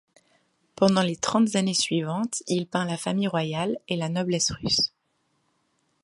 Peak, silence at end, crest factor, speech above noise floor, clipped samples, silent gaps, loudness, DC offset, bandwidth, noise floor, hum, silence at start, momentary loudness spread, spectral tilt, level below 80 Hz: -6 dBFS; 1.15 s; 20 dB; 47 dB; under 0.1%; none; -25 LUFS; under 0.1%; 11.5 kHz; -72 dBFS; none; 0.8 s; 6 LU; -4 dB/octave; -58 dBFS